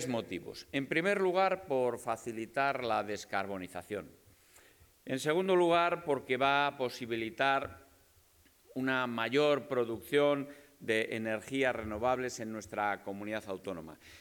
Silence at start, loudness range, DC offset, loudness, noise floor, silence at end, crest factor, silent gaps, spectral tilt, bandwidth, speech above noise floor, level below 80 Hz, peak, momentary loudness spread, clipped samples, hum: 0 s; 5 LU; under 0.1%; -33 LUFS; -65 dBFS; 0 s; 18 dB; none; -4.5 dB/octave; 19 kHz; 32 dB; -70 dBFS; -14 dBFS; 13 LU; under 0.1%; none